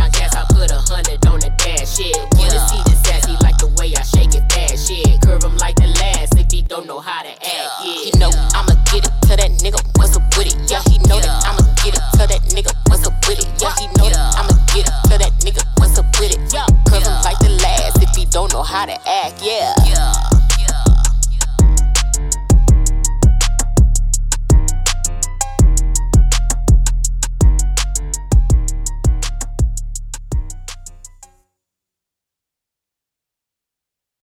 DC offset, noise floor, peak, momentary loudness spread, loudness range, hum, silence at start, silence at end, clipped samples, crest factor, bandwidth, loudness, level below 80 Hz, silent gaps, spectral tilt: under 0.1%; -84 dBFS; -2 dBFS; 8 LU; 5 LU; none; 0 s; 3.35 s; under 0.1%; 10 dB; 16 kHz; -15 LUFS; -14 dBFS; none; -4 dB/octave